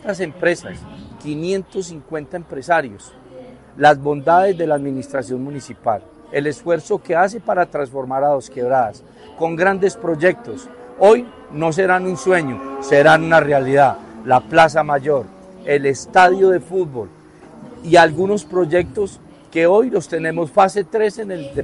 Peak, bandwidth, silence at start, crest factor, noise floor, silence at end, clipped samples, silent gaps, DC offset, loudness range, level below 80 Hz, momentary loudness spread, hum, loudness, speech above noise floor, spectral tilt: 0 dBFS; 11.5 kHz; 0.05 s; 16 dB; -40 dBFS; 0 s; under 0.1%; none; under 0.1%; 6 LU; -52 dBFS; 16 LU; none; -17 LUFS; 24 dB; -5.5 dB/octave